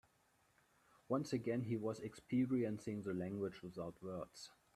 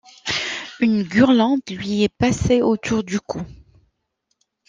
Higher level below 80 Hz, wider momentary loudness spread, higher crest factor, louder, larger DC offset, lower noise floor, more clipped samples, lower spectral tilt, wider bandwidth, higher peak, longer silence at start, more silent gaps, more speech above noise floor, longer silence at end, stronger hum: second, -76 dBFS vs -44 dBFS; about the same, 11 LU vs 11 LU; about the same, 18 dB vs 18 dB; second, -43 LUFS vs -19 LUFS; neither; about the same, -76 dBFS vs -73 dBFS; neither; first, -7 dB/octave vs -5.5 dB/octave; first, 13 kHz vs 9.4 kHz; second, -26 dBFS vs -2 dBFS; first, 1.1 s vs 0.25 s; neither; second, 34 dB vs 55 dB; second, 0.25 s vs 1.15 s; neither